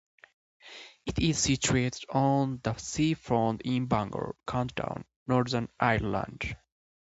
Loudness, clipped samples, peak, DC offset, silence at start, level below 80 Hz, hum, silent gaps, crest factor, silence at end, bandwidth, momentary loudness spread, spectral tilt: -29 LUFS; under 0.1%; -8 dBFS; under 0.1%; 0.65 s; -50 dBFS; none; 5.16-5.26 s; 22 dB; 0.45 s; 8.2 kHz; 11 LU; -5 dB/octave